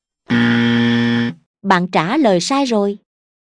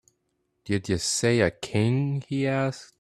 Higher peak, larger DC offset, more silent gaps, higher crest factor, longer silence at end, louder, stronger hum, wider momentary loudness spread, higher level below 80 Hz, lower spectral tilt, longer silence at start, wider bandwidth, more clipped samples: first, 0 dBFS vs -6 dBFS; neither; first, 1.46-1.54 s vs none; about the same, 16 dB vs 20 dB; first, 0.6 s vs 0.15 s; first, -16 LUFS vs -26 LUFS; neither; about the same, 8 LU vs 7 LU; about the same, -58 dBFS vs -56 dBFS; about the same, -5.5 dB/octave vs -5 dB/octave; second, 0.3 s vs 0.65 s; second, 10.5 kHz vs 13.5 kHz; neither